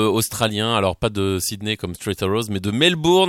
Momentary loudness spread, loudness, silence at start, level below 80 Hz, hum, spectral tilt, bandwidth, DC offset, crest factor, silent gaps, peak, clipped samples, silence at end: 8 LU; -20 LUFS; 0 s; -46 dBFS; none; -4.5 dB/octave; 17 kHz; under 0.1%; 16 dB; none; -4 dBFS; under 0.1%; 0 s